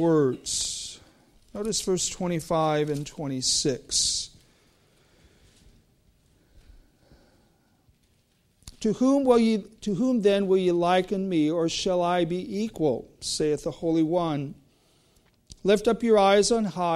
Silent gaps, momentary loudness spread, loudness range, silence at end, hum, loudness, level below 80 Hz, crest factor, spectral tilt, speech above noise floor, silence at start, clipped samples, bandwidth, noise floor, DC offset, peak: none; 11 LU; 5 LU; 0 s; none; -25 LUFS; -54 dBFS; 18 dB; -4 dB/octave; 42 dB; 0 s; under 0.1%; 14.5 kHz; -66 dBFS; under 0.1%; -8 dBFS